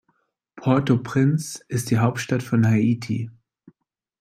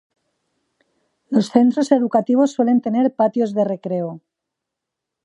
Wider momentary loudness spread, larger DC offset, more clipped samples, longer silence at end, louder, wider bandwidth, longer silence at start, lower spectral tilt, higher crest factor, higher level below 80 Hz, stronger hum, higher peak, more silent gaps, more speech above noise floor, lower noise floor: about the same, 9 LU vs 8 LU; neither; neither; second, 0.9 s vs 1.05 s; second, -22 LUFS vs -18 LUFS; first, 15 kHz vs 10 kHz; second, 0.55 s vs 1.3 s; about the same, -6.5 dB/octave vs -7 dB/octave; about the same, 18 dB vs 18 dB; first, -60 dBFS vs -72 dBFS; neither; about the same, -4 dBFS vs -2 dBFS; neither; second, 52 dB vs 65 dB; second, -72 dBFS vs -82 dBFS